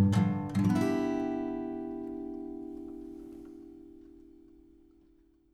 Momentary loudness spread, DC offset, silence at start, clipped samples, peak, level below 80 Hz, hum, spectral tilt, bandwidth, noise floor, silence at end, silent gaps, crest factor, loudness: 23 LU; under 0.1%; 0 s; under 0.1%; -14 dBFS; -60 dBFS; none; -8 dB/octave; 13.5 kHz; -64 dBFS; 1.25 s; none; 18 dB; -33 LUFS